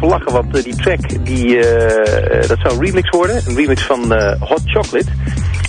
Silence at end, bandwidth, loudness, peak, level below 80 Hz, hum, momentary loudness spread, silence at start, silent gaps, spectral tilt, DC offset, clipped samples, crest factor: 0 s; 10 kHz; -14 LUFS; -2 dBFS; -24 dBFS; none; 6 LU; 0 s; none; -6 dB/octave; under 0.1%; under 0.1%; 12 dB